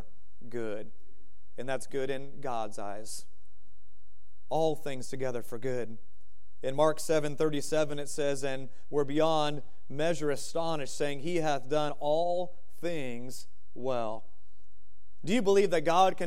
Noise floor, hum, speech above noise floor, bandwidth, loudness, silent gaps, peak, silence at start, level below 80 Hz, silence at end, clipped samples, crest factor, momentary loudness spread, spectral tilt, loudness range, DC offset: -66 dBFS; none; 35 dB; 16 kHz; -32 LUFS; none; -10 dBFS; 0.45 s; -64 dBFS; 0 s; under 0.1%; 22 dB; 16 LU; -5 dB/octave; 8 LU; 3%